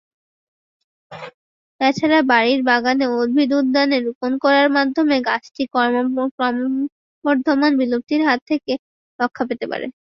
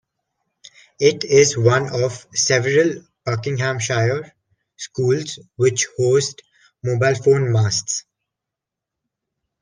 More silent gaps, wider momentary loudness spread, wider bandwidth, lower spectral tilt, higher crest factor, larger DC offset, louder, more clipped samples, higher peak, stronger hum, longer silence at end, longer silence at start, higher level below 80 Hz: first, 1.34-1.79 s, 4.15-4.21 s, 6.31-6.38 s, 6.92-7.22 s, 8.42-8.46 s, 8.79-9.19 s vs none; about the same, 11 LU vs 12 LU; second, 7.2 kHz vs 10.5 kHz; about the same, -5 dB/octave vs -4.5 dB/octave; about the same, 18 dB vs 20 dB; neither; about the same, -18 LUFS vs -19 LUFS; neither; about the same, -2 dBFS vs 0 dBFS; neither; second, 0.25 s vs 1.6 s; about the same, 1.1 s vs 1 s; about the same, -64 dBFS vs -60 dBFS